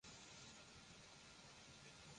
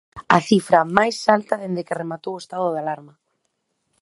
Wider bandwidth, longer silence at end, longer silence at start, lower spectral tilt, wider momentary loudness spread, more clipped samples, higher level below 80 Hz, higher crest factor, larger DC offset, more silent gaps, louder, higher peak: about the same, 11 kHz vs 11.5 kHz; second, 0 s vs 0.95 s; about the same, 0.05 s vs 0.15 s; second, -2.5 dB/octave vs -5.5 dB/octave; second, 2 LU vs 13 LU; neither; second, -78 dBFS vs -60 dBFS; second, 14 dB vs 20 dB; neither; neither; second, -60 LUFS vs -20 LUFS; second, -48 dBFS vs 0 dBFS